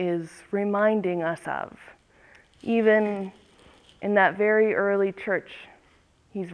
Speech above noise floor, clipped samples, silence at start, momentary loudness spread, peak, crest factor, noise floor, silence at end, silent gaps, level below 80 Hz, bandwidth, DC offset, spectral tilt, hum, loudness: 36 dB; under 0.1%; 0 s; 18 LU; -8 dBFS; 18 dB; -61 dBFS; 0 s; none; -66 dBFS; 11 kHz; under 0.1%; -7 dB/octave; none; -24 LUFS